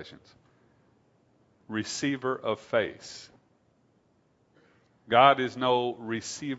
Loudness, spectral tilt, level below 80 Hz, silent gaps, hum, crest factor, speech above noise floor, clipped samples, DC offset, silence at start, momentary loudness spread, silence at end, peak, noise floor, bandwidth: -27 LUFS; -4 dB/octave; -72 dBFS; none; none; 26 dB; 40 dB; under 0.1%; under 0.1%; 0 s; 21 LU; 0 s; -4 dBFS; -68 dBFS; 8 kHz